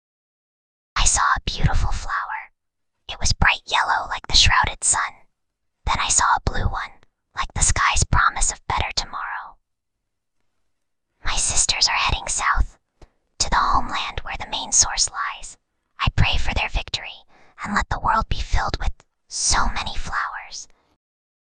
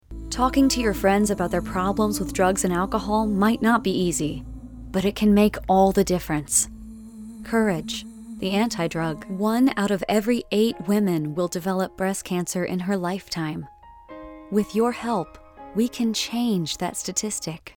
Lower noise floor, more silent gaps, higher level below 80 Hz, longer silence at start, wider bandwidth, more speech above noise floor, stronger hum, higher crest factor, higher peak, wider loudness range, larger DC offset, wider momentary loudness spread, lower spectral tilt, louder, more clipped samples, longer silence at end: first, -79 dBFS vs -43 dBFS; neither; first, -28 dBFS vs -42 dBFS; first, 0.95 s vs 0.1 s; second, 10 kHz vs 19.5 kHz; first, 59 dB vs 20 dB; neither; about the same, 20 dB vs 18 dB; first, -2 dBFS vs -6 dBFS; about the same, 5 LU vs 5 LU; neither; about the same, 14 LU vs 13 LU; second, -1.5 dB/octave vs -4.5 dB/octave; about the same, -21 LUFS vs -23 LUFS; neither; first, 0.85 s vs 0.05 s